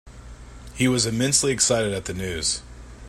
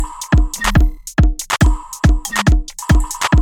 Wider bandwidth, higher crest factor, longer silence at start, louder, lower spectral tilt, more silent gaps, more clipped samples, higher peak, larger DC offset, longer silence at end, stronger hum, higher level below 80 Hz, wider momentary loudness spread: second, 16 kHz vs 18 kHz; first, 20 dB vs 14 dB; about the same, 0.05 s vs 0 s; second, -22 LUFS vs -16 LUFS; second, -3 dB/octave vs -5 dB/octave; neither; neither; second, -6 dBFS vs 0 dBFS; neither; about the same, 0 s vs 0 s; first, 60 Hz at -50 dBFS vs none; second, -44 dBFS vs -16 dBFS; first, 10 LU vs 2 LU